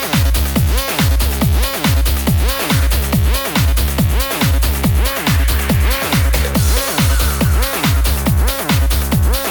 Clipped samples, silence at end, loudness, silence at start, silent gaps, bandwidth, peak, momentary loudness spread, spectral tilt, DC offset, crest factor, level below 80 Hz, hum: under 0.1%; 0 s; -15 LUFS; 0 s; none; over 20 kHz; -2 dBFS; 1 LU; -4.5 dB/octave; under 0.1%; 10 dB; -16 dBFS; none